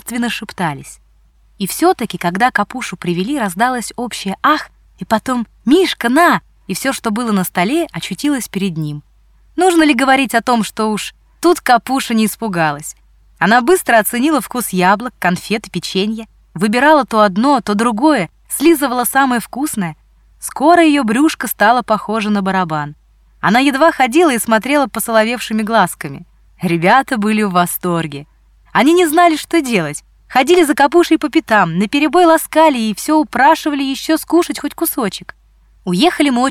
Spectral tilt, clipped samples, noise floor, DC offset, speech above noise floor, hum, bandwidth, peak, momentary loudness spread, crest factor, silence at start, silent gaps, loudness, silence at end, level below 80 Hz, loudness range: -4.5 dB/octave; under 0.1%; -50 dBFS; under 0.1%; 37 dB; none; 18 kHz; 0 dBFS; 11 LU; 14 dB; 0.05 s; none; -14 LUFS; 0 s; -48 dBFS; 4 LU